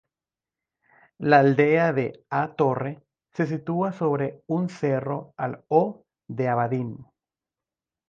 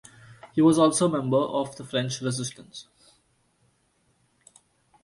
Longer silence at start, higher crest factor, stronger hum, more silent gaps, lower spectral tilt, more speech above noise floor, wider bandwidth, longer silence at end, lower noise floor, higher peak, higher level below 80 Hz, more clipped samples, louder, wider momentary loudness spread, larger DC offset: first, 1.2 s vs 0.3 s; about the same, 22 dB vs 20 dB; neither; neither; first, -8.5 dB/octave vs -5 dB/octave; first, over 67 dB vs 44 dB; second, 7.4 kHz vs 11.5 kHz; second, 1.05 s vs 2.2 s; first, under -90 dBFS vs -68 dBFS; about the same, -4 dBFS vs -6 dBFS; about the same, -68 dBFS vs -66 dBFS; neither; about the same, -24 LUFS vs -24 LUFS; second, 13 LU vs 20 LU; neither